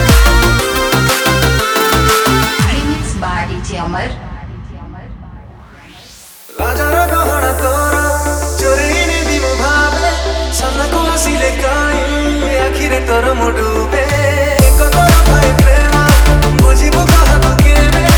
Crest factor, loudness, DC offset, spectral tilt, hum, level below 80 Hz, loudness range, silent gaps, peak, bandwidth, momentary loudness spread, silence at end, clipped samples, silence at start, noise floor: 10 dB; -11 LUFS; under 0.1%; -4.5 dB/octave; none; -14 dBFS; 10 LU; none; 0 dBFS; over 20 kHz; 10 LU; 0 s; under 0.1%; 0 s; -36 dBFS